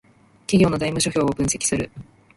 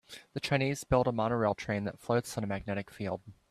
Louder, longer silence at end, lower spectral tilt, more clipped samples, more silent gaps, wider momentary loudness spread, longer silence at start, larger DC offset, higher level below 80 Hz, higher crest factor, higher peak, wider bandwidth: first, -21 LUFS vs -32 LUFS; first, 0.35 s vs 0.2 s; second, -4.5 dB/octave vs -6 dB/octave; neither; neither; about the same, 10 LU vs 9 LU; first, 0.5 s vs 0.1 s; neither; first, -44 dBFS vs -54 dBFS; about the same, 18 dB vs 20 dB; first, -4 dBFS vs -14 dBFS; second, 11.5 kHz vs 14.5 kHz